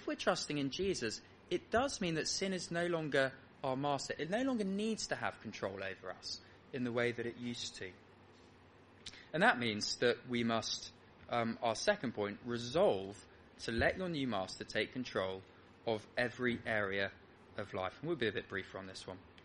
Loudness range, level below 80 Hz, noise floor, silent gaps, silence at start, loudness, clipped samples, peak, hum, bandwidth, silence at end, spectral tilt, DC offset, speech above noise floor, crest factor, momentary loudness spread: 4 LU; -64 dBFS; -62 dBFS; none; 0 s; -38 LUFS; under 0.1%; -14 dBFS; none; 10.5 kHz; 0 s; -4 dB/octave; under 0.1%; 24 dB; 24 dB; 13 LU